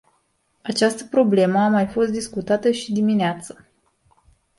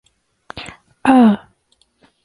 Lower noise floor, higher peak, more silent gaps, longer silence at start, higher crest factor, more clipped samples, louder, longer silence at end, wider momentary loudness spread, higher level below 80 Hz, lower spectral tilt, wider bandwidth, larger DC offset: first, -67 dBFS vs -61 dBFS; about the same, -4 dBFS vs -2 dBFS; neither; about the same, 0.65 s vs 0.55 s; about the same, 18 dB vs 16 dB; neither; second, -20 LUFS vs -14 LUFS; first, 1.05 s vs 0.9 s; second, 10 LU vs 24 LU; second, -58 dBFS vs -52 dBFS; second, -5.5 dB/octave vs -7 dB/octave; about the same, 11.5 kHz vs 11 kHz; neither